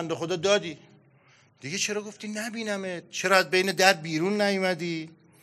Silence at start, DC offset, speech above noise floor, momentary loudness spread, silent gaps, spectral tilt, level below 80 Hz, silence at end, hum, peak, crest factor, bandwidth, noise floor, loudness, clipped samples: 0 s; under 0.1%; 33 dB; 14 LU; none; -3.5 dB/octave; -78 dBFS; 0.3 s; none; -2 dBFS; 26 dB; 15 kHz; -60 dBFS; -26 LUFS; under 0.1%